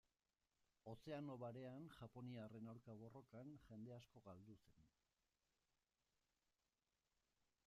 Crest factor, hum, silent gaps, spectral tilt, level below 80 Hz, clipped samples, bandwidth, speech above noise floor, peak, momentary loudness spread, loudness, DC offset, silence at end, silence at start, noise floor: 18 dB; none; none; -7.5 dB/octave; -86 dBFS; under 0.1%; 12 kHz; over 32 dB; -42 dBFS; 10 LU; -59 LUFS; under 0.1%; 2.8 s; 0.85 s; under -90 dBFS